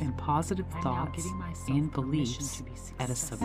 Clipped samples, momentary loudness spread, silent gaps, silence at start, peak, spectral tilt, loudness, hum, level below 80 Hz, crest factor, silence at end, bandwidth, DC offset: under 0.1%; 7 LU; none; 0 s; -16 dBFS; -5.5 dB/octave; -32 LUFS; none; -46 dBFS; 16 dB; 0 s; 16 kHz; under 0.1%